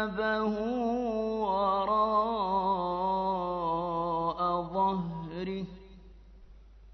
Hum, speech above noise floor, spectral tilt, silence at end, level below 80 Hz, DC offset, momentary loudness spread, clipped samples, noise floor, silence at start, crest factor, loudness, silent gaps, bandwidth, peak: none; 23 dB; -4.5 dB/octave; 0 s; -54 dBFS; under 0.1%; 9 LU; under 0.1%; -52 dBFS; 0 s; 14 dB; -30 LUFS; none; 6.2 kHz; -16 dBFS